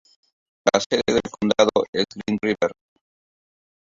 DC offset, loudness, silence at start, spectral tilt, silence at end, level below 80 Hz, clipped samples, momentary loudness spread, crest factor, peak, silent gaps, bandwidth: under 0.1%; -22 LUFS; 0.65 s; -4 dB/octave; 1.25 s; -56 dBFS; under 0.1%; 6 LU; 22 dB; -2 dBFS; 0.86-0.90 s, 1.88-1.93 s; 7.8 kHz